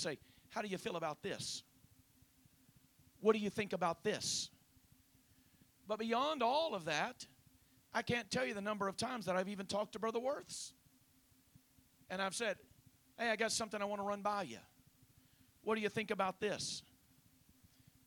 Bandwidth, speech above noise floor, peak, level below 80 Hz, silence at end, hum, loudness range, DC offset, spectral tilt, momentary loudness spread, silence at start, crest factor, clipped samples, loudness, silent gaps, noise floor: 19 kHz; 31 dB; -18 dBFS; -76 dBFS; 1.25 s; none; 4 LU; under 0.1%; -3.5 dB/octave; 12 LU; 0 s; 24 dB; under 0.1%; -40 LUFS; none; -71 dBFS